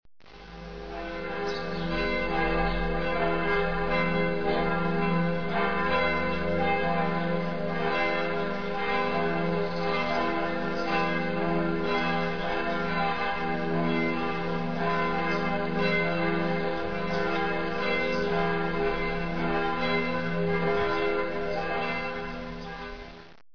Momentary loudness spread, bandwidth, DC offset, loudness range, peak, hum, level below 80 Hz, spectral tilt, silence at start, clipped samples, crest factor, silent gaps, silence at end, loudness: 5 LU; 5.4 kHz; 2%; 2 LU; -14 dBFS; none; -44 dBFS; -7 dB/octave; 0 s; under 0.1%; 14 dB; none; 0 s; -28 LUFS